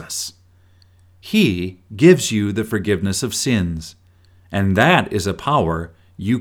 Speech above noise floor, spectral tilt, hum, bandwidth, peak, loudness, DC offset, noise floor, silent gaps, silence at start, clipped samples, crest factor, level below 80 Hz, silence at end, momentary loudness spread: 34 dB; -5 dB/octave; none; 18.5 kHz; 0 dBFS; -18 LUFS; under 0.1%; -52 dBFS; none; 0 s; under 0.1%; 18 dB; -44 dBFS; 0 s; 15 LU